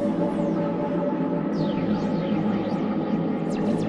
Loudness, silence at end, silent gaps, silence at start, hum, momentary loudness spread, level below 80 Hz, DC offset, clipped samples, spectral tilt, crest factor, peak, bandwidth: -25 LUFS; 0 s; none; 0 s; none; 1 LU; -54 dBFS; under 0.1%; under 0.1%; -8.5 dB/octave; 12 dB; -12 dBFS; 10.5 kHz